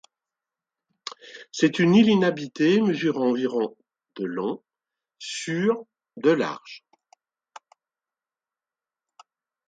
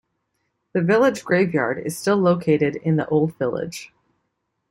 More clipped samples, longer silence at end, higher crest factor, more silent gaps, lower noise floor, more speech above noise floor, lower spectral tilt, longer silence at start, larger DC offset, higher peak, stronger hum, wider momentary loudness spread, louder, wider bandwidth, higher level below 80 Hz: neither; first, 2.9 s vs 0.85 s; about the same, 20 dB vs 16 dB; neither; first, under -90 dBFS vs -75 dBFS; first, over 68 dB vs 55 dB; about the same, -6 dB/octave vs -6.5 dB/octave; first, 1.05 s vs 0.75 s; neither; about the same, -6 dBFS vs -6 dBFS; neither; first, 21 LU vs 9 LU; second, -23 LUFS vs -20 LUFS; second, 9.2 kHz vs 16 kHz; second, -72 dBFS vs -60 dBFS